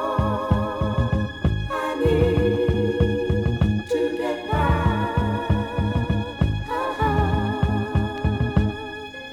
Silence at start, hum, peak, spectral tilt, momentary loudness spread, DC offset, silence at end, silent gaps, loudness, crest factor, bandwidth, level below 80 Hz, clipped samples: 0 s; none; -4 dBFS; -8 dB/octave; 5 LU; under 0.1%; 0 s; none; -23 LUFS; 18 dB; 12 kHz; -32 dBFS; under 0.1%